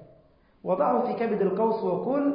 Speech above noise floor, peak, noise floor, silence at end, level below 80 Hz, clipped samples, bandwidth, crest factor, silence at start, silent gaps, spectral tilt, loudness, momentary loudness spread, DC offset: 34 dB; -12 dBFS; -59 dBFS; 0 s; -66 dBFS; under 0.1%; 5.2 kHz; 14 dB; 0 s; none; -12 dB/octave; -26 LUFS; 4 LU; under 0.1%